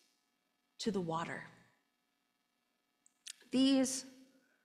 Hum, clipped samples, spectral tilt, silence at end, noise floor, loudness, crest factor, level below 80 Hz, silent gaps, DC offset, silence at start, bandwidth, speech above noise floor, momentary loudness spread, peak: none; under 0.1%; -4 dB/octave; 0.55 s; -82 dBFS; -35 LUFS; 18 dB; -78 dBFS; none; under 0.1%; 0.8 s; 14.5 kHz; 48 dB; 24 LU; -22 dBFS